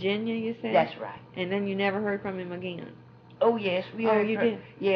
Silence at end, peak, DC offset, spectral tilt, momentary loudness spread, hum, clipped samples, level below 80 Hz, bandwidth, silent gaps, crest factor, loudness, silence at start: 0 s; -12 dBFS; under 0.1%; -4 dB/octave; 12 LU; none; under 0.1%; -70 dBFS; 5.8 kHz; none; 16 dB; -28 LUFS; 0 s